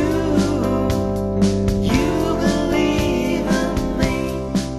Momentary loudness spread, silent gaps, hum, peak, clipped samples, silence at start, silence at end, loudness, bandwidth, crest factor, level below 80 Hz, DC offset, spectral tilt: 3 LU; none; none; -4 dBFS; under 0.1%; 0 s; 0 s; -19 LUFS; 13 kHz; 14 dB; -30 dBFS; under 0.1%; -6 dB/octave